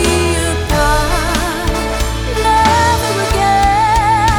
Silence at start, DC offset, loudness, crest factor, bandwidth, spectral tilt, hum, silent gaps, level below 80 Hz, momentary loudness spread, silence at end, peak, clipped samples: 0 s; under 0.1%; -13 LUFS; 12 dB; over 20 kHz; -4 dB/octave; none; none; -20 dBFS; 6 LU; 0 s; 0 dBFS; under 0.1%